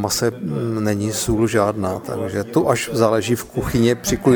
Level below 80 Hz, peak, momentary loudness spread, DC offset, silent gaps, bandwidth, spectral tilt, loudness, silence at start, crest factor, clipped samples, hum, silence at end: -40 dBFS; -2 dBFS; 7 LU; under 0.1%; none; over 20 kHz; -5 dB/octave; -20 LUFS; 0 s; 18 dB; under 0.1%; none; 0 s